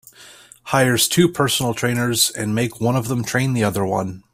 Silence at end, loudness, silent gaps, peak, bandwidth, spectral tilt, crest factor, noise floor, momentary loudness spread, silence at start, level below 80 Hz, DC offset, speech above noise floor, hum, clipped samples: 0.15 s; -19 LUFS; none; -2 dBFS; 16 kHz; -4 dB/octave; 18 dB; -45 dBFS; 6 LU; 0.2 s; -52 dBFS; under 0.1%; 26 dB; none; under 0.1%